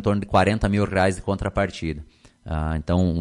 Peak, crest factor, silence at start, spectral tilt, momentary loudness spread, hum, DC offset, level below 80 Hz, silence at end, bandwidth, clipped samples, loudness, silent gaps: -6 dBFS; 16 dB; 0 s; -7 dB/octave; 11 LU; none; under 0.1%; -36 dBFS; 0 s; 11 kHz; under 0.1%; -23 LUFS; none